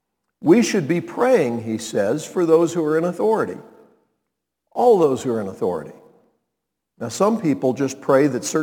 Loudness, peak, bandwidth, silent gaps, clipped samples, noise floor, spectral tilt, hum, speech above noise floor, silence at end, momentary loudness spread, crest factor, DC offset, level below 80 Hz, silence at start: -19 LUFS; -2 dBFS; 18.5 kHz; none; under 0.1%; -80 dBFS; -5.5 dB/octave; none; 61 dB; 0 s; 10 LU; 18 dB; under 0.1%; -68 dBFS; 0.4 s